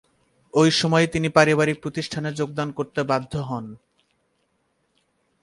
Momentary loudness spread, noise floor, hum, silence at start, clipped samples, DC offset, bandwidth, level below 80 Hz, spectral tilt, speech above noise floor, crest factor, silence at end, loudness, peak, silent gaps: 12 LU; -70 dBFS; none; 0.55 s; under 0.1%; under 0.1%; 11.5 kHz; -54 dBFS; -5 dB/octave; 48 dB; 24 dB; 1.65 s; -22 LUFS; 0 dBFS; none